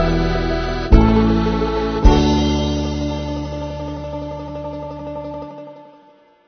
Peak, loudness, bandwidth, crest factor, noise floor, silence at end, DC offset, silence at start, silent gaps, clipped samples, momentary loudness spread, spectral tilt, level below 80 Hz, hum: 0 dBFS; -19 LUFS; 6.6 kHz; 18 dB; -50 dBFS; 0.6 s; under 0.1%; 0 s; none; under 0.1%; 15 LU; -7 dB/octave; -22 dBFS; none